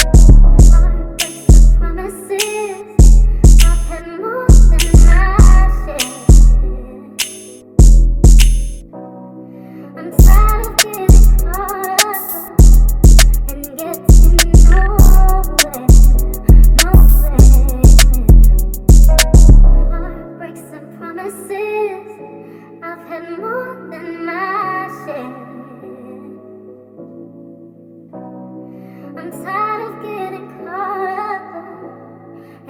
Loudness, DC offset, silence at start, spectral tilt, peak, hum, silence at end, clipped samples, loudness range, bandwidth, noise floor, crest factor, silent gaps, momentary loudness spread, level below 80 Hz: -12 LUFS; under 0.1%; 0 s; -5 dB/octave; 0 dBFS; none; 0.8 s; 0.6%; 15 LU; 17 kHz; -39 dBFS; 10 dB; none; 23 LU; -10 dBFS